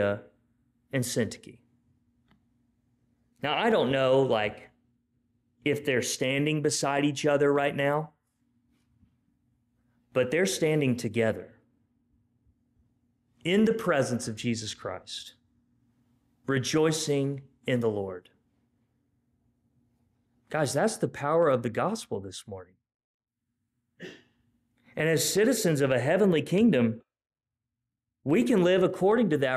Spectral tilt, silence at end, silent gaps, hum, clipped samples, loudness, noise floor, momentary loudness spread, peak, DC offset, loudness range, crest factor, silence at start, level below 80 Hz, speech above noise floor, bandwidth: -5 dB/octave; 0 s; 22.94-23.20 s; none; under 0.1%; -27 LUFS; -89 dBFS; 15 LU; -14 dBFS; under 0.1%; 8 LU; 14 dB; 0 s; -68 dBFS; 63 dB; 15.5 kHz